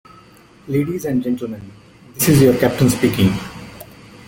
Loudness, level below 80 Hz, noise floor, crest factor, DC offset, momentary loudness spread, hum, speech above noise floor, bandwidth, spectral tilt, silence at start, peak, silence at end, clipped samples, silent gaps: -17 LUFS; -44 dBFS; -46 dBFS; 18 dB; under 0.1%; 23 LU; none; 30 dB; 17 kHz; -6 dB/octave; 0.65 s; -2 dBFS; 0.45 s; under 0.1%; none